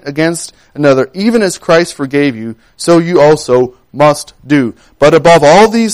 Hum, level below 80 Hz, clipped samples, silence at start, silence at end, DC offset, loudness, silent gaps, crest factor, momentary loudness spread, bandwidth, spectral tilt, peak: none; -42 dBFS; 0.2%; 0.05 s; 0 s; under 0.1%; -9 LUFS; none; 10 dB; 13 LU; 16 kHz; -5 dB/octave; 0 dBFS